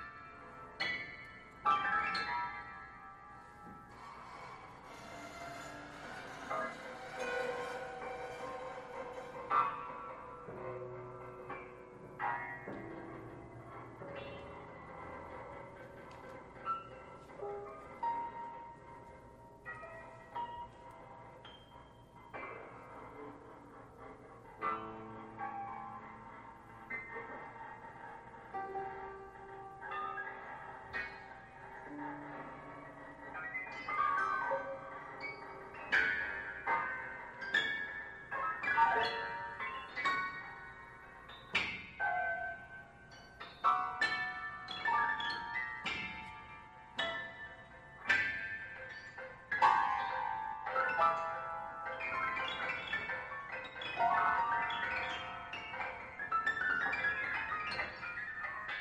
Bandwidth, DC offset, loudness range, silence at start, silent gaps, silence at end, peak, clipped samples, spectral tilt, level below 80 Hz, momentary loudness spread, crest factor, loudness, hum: 13 kHz; under 0.1%; 13 LU; 0 s; none; 0 s; -16 dBFS; under 0.1%; -3.5 dB/octave; -66 dBFS; 19 LU; 24 dB; -38 LUFS; none